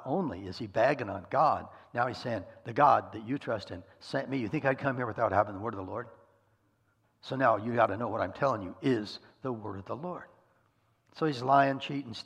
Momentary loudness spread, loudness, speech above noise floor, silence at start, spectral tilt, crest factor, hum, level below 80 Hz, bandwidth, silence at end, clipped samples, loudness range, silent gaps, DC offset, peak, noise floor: 14 LU; -31 LUFS; 41 dB; 0 s; -7 dB/octave; 22 dB; none; -70 dBFS; 9.8 kHz; 0.05 s; under 0.1%; 4 LU; none; under 0.1%; -10 dBFS; -72 dBFS